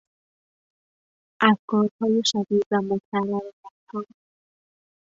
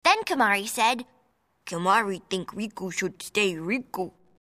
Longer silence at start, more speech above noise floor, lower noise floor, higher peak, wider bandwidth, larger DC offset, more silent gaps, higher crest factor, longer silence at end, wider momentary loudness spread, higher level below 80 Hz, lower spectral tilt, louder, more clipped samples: first, 1.4 s vs 0.05 s; first, over 67 dB vs 41 dB; first, under -90 dBFS vs -68 dBFS; first, -2 dBFS vs -6 dBFS; second, 7.8 kHz vs 15.5 kHz; neither; first, 1.59-1.68 s, 1.91-1.99 s, 2.66-2.71 s, 3.05-3.12 s, 3.53-3.63 s, 3.71-3.87 s vs none; about the same, 24 dB vs 20 dB; first, 1 s vs 0.35 s; first, 15 LU vs 12 LU; about the same, -68 dBFS vs -70 dBFS; first, -4.5 dB/octave vs -3 dB/octave; first, -23 LUFS vs -26 LUFS; neither